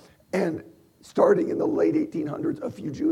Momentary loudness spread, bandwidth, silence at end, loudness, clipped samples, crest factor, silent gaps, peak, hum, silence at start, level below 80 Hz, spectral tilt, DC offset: 12 LU; 12 kHz; 0 s; -25 LUFS; under 0.1%; 20 dB; none; -6 dBFS; none; 0.35 s; -64 dBFS; -7.5 dB/octave; under 0.1%